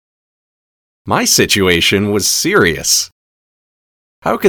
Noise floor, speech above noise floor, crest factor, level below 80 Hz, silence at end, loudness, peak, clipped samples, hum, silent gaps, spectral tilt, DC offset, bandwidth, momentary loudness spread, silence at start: under -90 dBFS; over 77 dB; 16 dB; -44 dBFS; 0 s; -12 LUFS; 0 dBFS; under 0.1%; none; 3.12-4.22 s; -2.5 dB/octave; under 0.1%; 19.5 kHz; 9 LU; 1.05 s